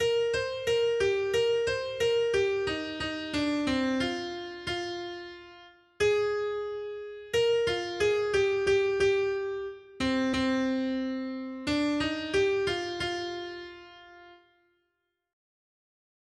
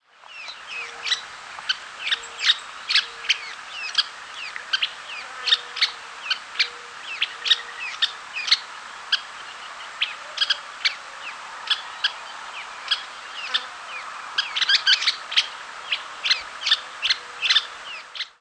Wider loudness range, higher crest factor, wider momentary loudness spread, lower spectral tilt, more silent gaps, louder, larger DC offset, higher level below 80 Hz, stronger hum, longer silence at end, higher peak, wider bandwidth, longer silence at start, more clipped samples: about the same, 5 LU vs 5 LU; second, 14 dB vs 24 dB; second, 12 LU vs 15 LU; first, -4.5 dB/octave vs 3 dB/octave; neither; second, -29 LUFS vs -23 LUFS; neither; first, -56 dBFS vs -72 dBFS; neither; first, 1.95 s vs 0.1 s; second, -16 dBFS vs -4 dBFS; first, 12.5 kHz vs 11 kHz; second, 0 s vs 0.2 s; neither